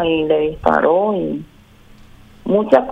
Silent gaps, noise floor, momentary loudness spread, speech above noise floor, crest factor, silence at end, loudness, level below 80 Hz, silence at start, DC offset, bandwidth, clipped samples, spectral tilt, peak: none; -45 dBFS; 12 LU; 29 dB; 16 dB; 0 s; -16 LUFS; -42 dBFS; 0 s; under 0.1%; 8 kHz; under 0.1%; -7.5 dB/octave; 0 dBFS